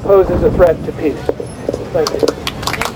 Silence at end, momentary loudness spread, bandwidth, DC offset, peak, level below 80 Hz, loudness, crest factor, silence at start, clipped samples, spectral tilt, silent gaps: 0 s; 11 LU; 16 kHz; under 0.1%; 0 dBFS; -28 dBFS; -15 LUFS; 14 dB; 0 s; under 0.1%; -5.5 dB/octave; none